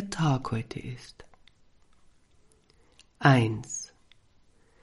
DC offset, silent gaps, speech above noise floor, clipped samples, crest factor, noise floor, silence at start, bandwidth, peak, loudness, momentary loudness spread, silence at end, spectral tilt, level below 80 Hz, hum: under 0.1%; none; 35 dB; under 0.1%; 24 dB; -62 dBFS; 0 s; 11.5 kHz; -8 dBFS; -27 LUFS; 23 LU; 1 s; -5.5 dB/octave; -58 dBFS; none